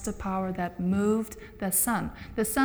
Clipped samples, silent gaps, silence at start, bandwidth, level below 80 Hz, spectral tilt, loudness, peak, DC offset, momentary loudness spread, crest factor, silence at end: under 0.1%; none; 0 s; over 20 kHz; -48 dBFS; -5 dB/octave; -28 LUFS; -12 dBFS; under 0.1%; 10 LU; 16 dB; 0 s